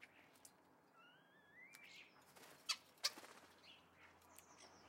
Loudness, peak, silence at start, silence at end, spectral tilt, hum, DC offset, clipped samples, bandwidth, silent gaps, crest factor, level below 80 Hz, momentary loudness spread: -49 LUFS; -22 dBFS; 0 s; 0 s; 0.5 dB/octave; none; under 0.1%; under 0.1%; 16 kHz; none; 34 dB; under -90 dBFS; 23 LU